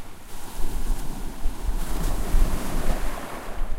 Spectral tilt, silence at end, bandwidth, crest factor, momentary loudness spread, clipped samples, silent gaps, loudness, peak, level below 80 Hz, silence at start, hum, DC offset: -5 dB/octave; 0 s; 16 kHz; 14 dB; 9 LU; under 0.1%; none; -32 LUFS; -8 dBFS; -24 dBFS; 0 s; none; under 0.1%